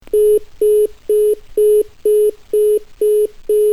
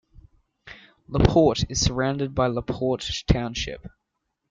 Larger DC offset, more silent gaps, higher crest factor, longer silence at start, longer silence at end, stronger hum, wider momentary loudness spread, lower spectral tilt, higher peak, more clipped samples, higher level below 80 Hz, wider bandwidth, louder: first, 0.7% vs under 0.1%; neither; second, 8 dB vs 22 dB; second, 0.1 s vs 0.65 s; second, 0 s vs 0.65 s; neither; second, 3 LU vs 13 LU; about the same, -4 dB/octave vs -5 dB/octave; second, -6 dBFS vs -2 dBFS; neither; second, -42 dBFS vs -36 dBFS; first, 12 kHz vs 9.4 kHz; first, -15 LUFS vs -23 LUFS